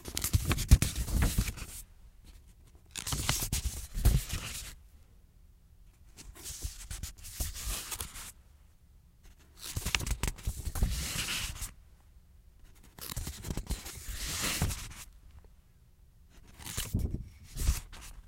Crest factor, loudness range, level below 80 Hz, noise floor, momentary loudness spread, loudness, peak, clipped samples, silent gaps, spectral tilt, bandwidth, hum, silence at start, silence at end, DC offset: 30 dB; 7 LU; -38 dBFS; -60 dBFS; 15 LU; -35 LUFS; -6 dBFS; under 0.1%; none; -3.5 dB/octave; 17 kHz; none; 0 s; 0 s; under 0.1%